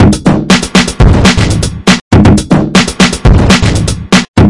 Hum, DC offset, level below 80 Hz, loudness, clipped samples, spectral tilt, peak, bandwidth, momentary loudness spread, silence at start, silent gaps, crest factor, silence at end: none; 2%; -16 dBFS; -7 LUFS; 4%; -5 dB/octave; 0 dBFS; 12 kHz; 4 LU; 0 s; 2.01-2.11 s, 4.28-4.34 s; 6 dB; 0 s